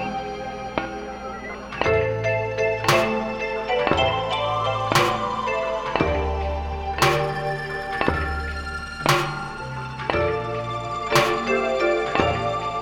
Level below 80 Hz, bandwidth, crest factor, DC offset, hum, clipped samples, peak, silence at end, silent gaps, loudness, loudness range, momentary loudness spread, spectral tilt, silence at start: -38 dBFS; 17.5 kHz; 22 dB; under 0.1%; none; under 0.1%; -2 dBFS; 0 s; none; -23 LUFS; 3 LU; 11 LU; -4.5 dB/octave; 0 s